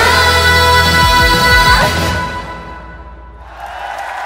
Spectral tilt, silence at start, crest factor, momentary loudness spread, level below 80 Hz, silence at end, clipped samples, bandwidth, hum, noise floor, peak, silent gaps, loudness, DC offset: -3 dB/octave; 0 s; 12 dB; 20 LU; -24 dBFS; 0 s; 0.2%; 16.5 kHz; none; -32 dBFS; 0 dBFS; none; -9 LUFS; under 0.1%